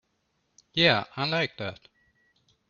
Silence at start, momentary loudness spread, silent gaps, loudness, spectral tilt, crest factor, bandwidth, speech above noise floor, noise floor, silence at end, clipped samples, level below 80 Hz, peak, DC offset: 0.75 s; 15 LU; none; -26 LUFS; -5 dB/octave; 24 dB; 7.2 kHz; 48 dB; -74 dBFS; 0.95 s; under 0.1%; -64 dBFS; -6 dBFS; under 0.1%